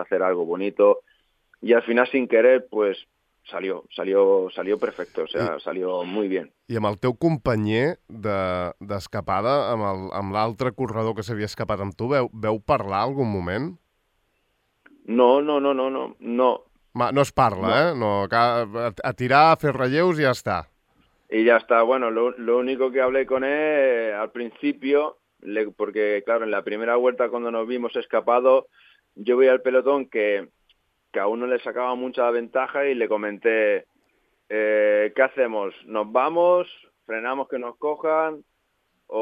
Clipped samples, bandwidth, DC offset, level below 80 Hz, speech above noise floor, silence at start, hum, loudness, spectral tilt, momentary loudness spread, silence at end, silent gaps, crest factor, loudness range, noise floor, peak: under 0.1%; 11.5 kHz; under 0.1%; -58 dBFS; 49 dB; 0 s; none; -22 LUFS; -6.5 dB/octave; 11 LU; 0 s; none; 20 dB; 5 LU; -71 dBFS; -4 dBFS